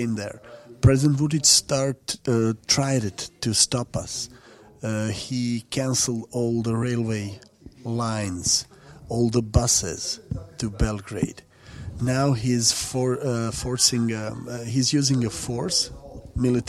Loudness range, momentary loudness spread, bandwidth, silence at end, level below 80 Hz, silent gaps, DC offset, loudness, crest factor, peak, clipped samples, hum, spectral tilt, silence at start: 5 LU; 12 LU; 15.5 kHz; 0 s; -40 dBFS; none; under 0.1%; -23 LUFS; 20 dB; -4 dBFS; under 0.1%; none; -4 dB/octave; 0 s